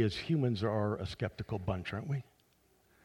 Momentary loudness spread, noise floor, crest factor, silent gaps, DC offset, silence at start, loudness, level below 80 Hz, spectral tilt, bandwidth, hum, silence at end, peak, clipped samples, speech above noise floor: 7 LU; -70 dBFS; 18 dB; none; under 0.1%; 0 s; -36 LUFS; -58 dBFS; -7.5 dB/octave; 11.5 kHz; none; 0.8 s; -18 dBFS; under 0.1%; 35 dB